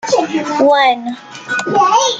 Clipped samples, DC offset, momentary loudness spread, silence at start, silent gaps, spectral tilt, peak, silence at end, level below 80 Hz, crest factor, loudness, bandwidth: under 0.1%; under 0.1%; 12 LU; 0.05 s; none; -2.5 dB/octave; -2 dBFS; 0 s; -64 dBFS; 12 dB; -13 LUFS; 9.2 kHz